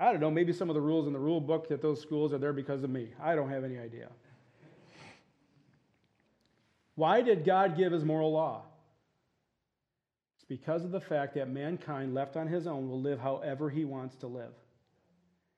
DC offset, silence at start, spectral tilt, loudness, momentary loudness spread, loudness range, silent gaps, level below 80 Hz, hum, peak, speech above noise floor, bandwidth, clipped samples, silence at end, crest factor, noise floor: under 0.1%; 0 s; -8.5 dB/octave; -32 LUFS; 16 LU; 8 LU; none; -84 dBFS; none; -14 dBFS; over 58 dB; 8.6 kHz; under 0.1%; 1.05 s; 20 dB; under -90 dBFS